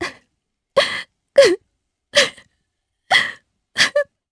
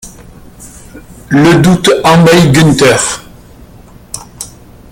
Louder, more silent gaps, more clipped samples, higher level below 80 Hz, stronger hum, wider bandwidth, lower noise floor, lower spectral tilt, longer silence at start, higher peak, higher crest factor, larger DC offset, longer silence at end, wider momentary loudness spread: second, -17 LUFS vs -7 LUFS; neither; second, under 0.1% vs 0.1%; second, -60 dBFS vs -36 dBFS; second, none vs 60 Hz at -25 dBFS; second, 11 kHz vs 17 kHz; first, -74 dBFS vs -35 dBFS; second, -1 dB/octave vs -5 dB/octave; about the same, 0 s vs 0.05 s; about the same, 0 dBFS vs 0 dBFS; first, 20 dB vs 10 dB; neither; second, 0.3 s vs 0.45 s; second, 13 LU vs 20 LU